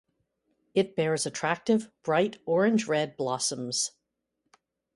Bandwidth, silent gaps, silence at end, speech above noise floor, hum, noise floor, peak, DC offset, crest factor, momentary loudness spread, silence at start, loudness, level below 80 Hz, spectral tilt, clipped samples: 11.5 kHz; none; 1.1 s; 54 dB; none; -81 dBFS; -12 dBFS; under 0.1%; 18 dB; 5 LU; 0.75 s; -28 LUFS; -72 dBFS; -4 dB/octave; under 0.1%